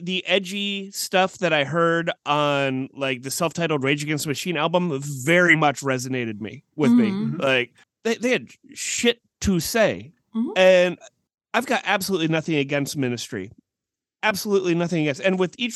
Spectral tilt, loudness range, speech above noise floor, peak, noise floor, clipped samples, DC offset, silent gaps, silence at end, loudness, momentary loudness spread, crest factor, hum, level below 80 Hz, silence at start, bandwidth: -4.5 dB/octave; 3 LU; 65 dB; -4 dBFS; -87 dBFS; under 0.1%; under 0.1%; 11.34-11.38 s; 0 s; -22 LUFS; 10 LU; 18 dB; none; -54 dBFS; 0 s; 13 kHz